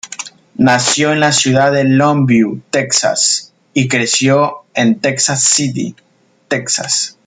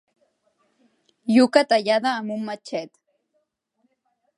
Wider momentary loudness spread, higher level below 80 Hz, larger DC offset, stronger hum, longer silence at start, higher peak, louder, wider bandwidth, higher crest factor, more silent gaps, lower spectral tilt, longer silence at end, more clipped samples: second, 9 LU vs 16 LU; first, -56 dBFS vs -78 dBFS; neither; neither; second, 0.05 s vs 1.25 s; about the same, 0 dBFS vs -2 dBFS; first, -12 LUFS vs -21 LUFS; second, 9.6 kHz vs 11.5 kHz; second, 14 dB vs 22 dB; neither; about the same, -3.5 dB/octave vs -4.5 dB/octave; second, 0.15 s vs 1.5 s; neither